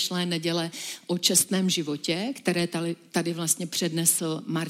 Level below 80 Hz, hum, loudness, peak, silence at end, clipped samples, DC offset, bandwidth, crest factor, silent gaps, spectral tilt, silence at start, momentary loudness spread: -74 dBFS; none; -25 LUFS; -8 dBFS; 0 s; under 0.1%; under 0.1%; 16.5 kHz; 20 dB; none; -3 dB/octave; 0 s; 8 LU